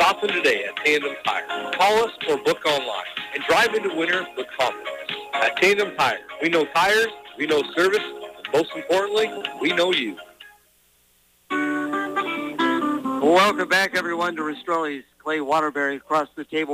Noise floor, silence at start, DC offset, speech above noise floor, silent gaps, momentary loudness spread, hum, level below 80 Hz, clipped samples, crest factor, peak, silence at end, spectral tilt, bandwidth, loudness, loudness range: -60 dBFS; 0 s; under 0.1%; 39 dB; none; 10 LU; none; -62 dBFS; under 0.1%; 16 dB; -8 dBFS; 0 s; -3 dB/octave; 15.5 kHz; -22 LUFS; 4 LU